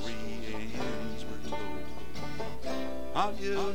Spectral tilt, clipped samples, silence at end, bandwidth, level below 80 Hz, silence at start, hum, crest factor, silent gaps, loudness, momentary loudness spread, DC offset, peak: -5 dB/octave; under 0.1%; 0 s; 19.5 kHz; -50 dBFS; 0 s; none; 20 dB; none; -37 LUFS; 9 LU; 4%; -14 dBFS